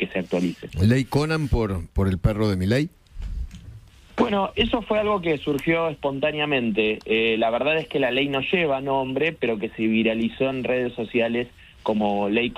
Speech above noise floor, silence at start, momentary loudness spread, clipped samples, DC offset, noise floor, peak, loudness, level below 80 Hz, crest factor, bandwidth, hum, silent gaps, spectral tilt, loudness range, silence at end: 22 dB; 0 s; 7 LU; under 0.1%; under 0.1%; -44 dBFS; -6 dBFS; -23 LUFS; -38 dBFS; 18 dB; 15 kHz; none; none; -6.5 dB/octave; 3 LU; 0.05 s